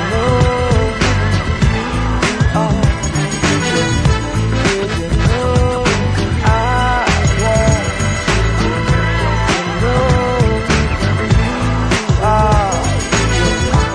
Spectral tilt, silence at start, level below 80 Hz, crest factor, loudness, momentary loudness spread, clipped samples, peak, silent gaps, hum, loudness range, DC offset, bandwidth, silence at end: -5 dB/octave; 0 s; -20 dBFS; 12 dB; -14 LUFS; 3 LU; under 0.1%; -2 dBFS; none; none; 1 LU; under 0.1%; 11 kHz; 0 s